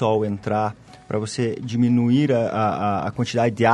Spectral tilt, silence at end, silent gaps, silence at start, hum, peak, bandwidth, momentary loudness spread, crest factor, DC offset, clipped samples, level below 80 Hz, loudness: -7 dB/octave; 0 s; none; 0 s; none; -2 dBFS; 10.5 kHz; 8 LU; 18 dB; under 0.1%; under 0.1%; -56 dBFS; -22 LUFS